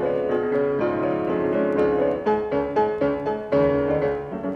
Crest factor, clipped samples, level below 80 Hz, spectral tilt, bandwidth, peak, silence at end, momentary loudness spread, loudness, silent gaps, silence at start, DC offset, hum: 14 dB; under 0.1%; -48 dBFS; -9 dB/octave; 6 kHz; -8 dBFS; 0 s; 3 LU; -23 LUFS; none; 0 s; under 0.1%; none